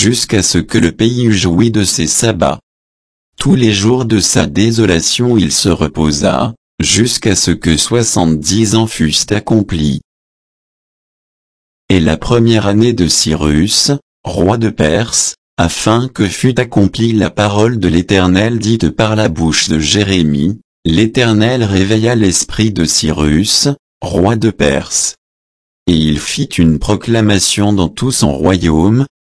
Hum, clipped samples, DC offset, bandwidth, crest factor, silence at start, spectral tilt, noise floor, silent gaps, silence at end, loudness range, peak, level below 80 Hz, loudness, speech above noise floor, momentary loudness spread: none; under 0.1%; under 0.1%; 11 kHz; 12 dB; 0 s; -4.5 dB/octave; under -90 dBFS; 2.63-3.33 s, 6.57-6.78 s, 10.04-11.88 s, 14.02-14.24 s, 15.38-15.57 s, 20.64-20.83 s, 23.79-24.01 s, 25.18-25.86 s; 0.2 s; 2 LU; 0 dBFS; -30 dBFS; -11 LUFS; over 79 dB; 5 LU